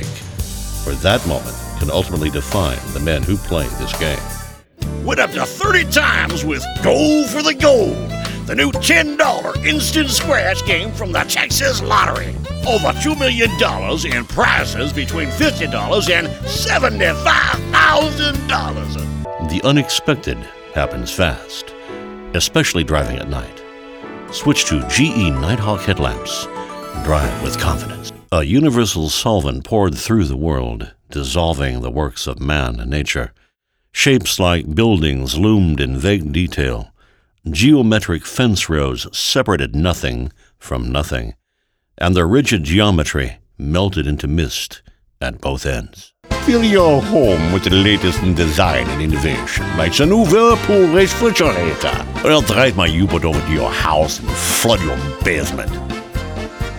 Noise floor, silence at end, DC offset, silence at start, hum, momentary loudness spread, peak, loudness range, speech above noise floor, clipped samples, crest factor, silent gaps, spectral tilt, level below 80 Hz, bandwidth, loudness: -69 dBFS; 0 s; under 0.1%; 0 s; none; 13 LU; 0 dBFS; 6 LU; 53 dB; under 0.1%; 16 dB; none; -4.5 dB/octave; -28 dBFS; over 20 kHz; -16 LUFS